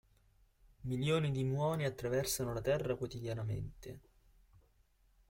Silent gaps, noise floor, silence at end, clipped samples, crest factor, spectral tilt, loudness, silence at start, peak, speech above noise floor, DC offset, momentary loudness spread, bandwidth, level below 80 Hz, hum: none; -71 dBFS; 1.3 s; under 0.1%; 18 dB; -5.5 dB/octave; -37 LUFS; 0.8 s; -22 dBFS; 34 dB; under 0.1%; 14 LU; 16.5 kHz; -58 dBFS; none